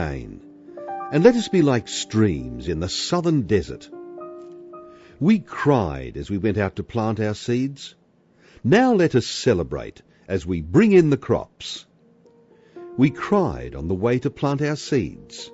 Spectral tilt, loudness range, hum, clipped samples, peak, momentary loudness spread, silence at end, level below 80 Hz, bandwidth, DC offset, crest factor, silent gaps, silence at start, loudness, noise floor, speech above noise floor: -6 dB/octave; 5 LU; none; under 0.1%; 0 dBFS; 21 LU; 0.05 s; -44 dBFS; 8 kHz; under 0.1%; 22 dB; none; 0 s; -21 LUFS; -57 dBFS; 36 dB